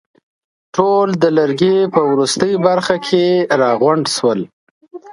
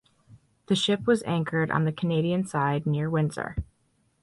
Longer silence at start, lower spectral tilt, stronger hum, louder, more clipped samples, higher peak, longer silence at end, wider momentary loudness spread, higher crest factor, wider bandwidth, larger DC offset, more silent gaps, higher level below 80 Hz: first, 0.75 s vs 0.3 s; about the same, -5 dB/octave vs -6 dB/octave; neither; first, -14 LUFS vs -26 LUFS; neither; first, 0 dBFS vs -10 dBFS; second, 0 s vs 0.6 s; second, 4 LU vs 8 LU; about the same, 14 dB vs 18 dB; about the same, 11.5 kHz vs 11.5 kHz; neither; first, 4.53-4.81 s vs none; second, -60 dBFS vs -48 dBFS